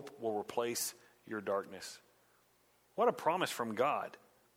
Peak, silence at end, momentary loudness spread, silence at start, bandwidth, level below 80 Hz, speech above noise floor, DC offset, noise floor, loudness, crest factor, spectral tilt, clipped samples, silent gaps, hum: -18 dBFS; 0.4 s; 15 LU; 0 s; 19.5 kHz; -84 dBFS; 35 dB; under 0.1%; -71 dBFS; -37 LUFS; 20 dB; -3 dB/octave; under 0.1%; none; 60 Hz at -70 dBFS